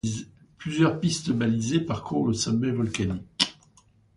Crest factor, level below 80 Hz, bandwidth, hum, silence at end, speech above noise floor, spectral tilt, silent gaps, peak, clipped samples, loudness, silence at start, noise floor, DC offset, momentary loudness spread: 24 dB; -52 dBFS; 11.5 kHz; none; 0.65 s; 34 dB; -5 dB/octave; none; -2 dBFS; under 0.1%; -26 LUFS; 0.05 s; -60 dBFS; under 0.1%; 8 LU